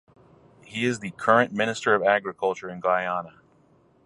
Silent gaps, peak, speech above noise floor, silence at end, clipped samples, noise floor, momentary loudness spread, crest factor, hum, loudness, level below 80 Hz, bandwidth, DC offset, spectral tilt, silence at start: none; -4 dBFS; 36 dB; 0.75 s; under 0.1%; -60 dBFS; 10 LU; 22 dB; none; -24 LUFS; -68 dBFS; 11.5 kHz; under 0.1%; -4.5 dB/octave; 0.7 s